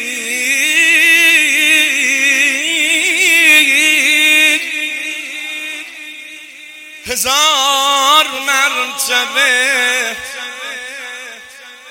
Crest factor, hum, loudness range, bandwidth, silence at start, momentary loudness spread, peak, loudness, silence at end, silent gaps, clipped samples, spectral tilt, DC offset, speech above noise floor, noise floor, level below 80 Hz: 14 dB; none; 7 LU; 17.5 kHz; 0 s; 19 LU; 0 dBFS; -10 LUFS; 0 s; none; under 0.1%; 1.5 dB/octave; under 0.1%; 23 dB; -36 dBFS; -58 dBFS